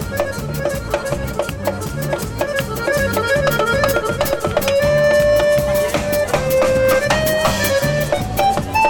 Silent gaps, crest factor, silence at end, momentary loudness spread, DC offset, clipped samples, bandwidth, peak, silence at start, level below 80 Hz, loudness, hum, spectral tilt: none; 12 dB; 0 s; 8 LU; under 0.1%; under 0.1%; 17.5 kHz; -4 dBFS; 0 s; -34 dBFS; -17 LUFS; none; -4.5 dB/octave